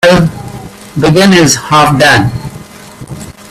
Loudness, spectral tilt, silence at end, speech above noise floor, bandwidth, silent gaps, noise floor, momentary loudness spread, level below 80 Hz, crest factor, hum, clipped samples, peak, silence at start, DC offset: -7 LUFS; -4.5 dB/octave; 0.2 s; 23 dB; 16 kHz; none; -29 dBFS; 21 LU; -34 dBFS; 10 dB; none; 0.3%; 0 dBFS; 0 s; under 0.1%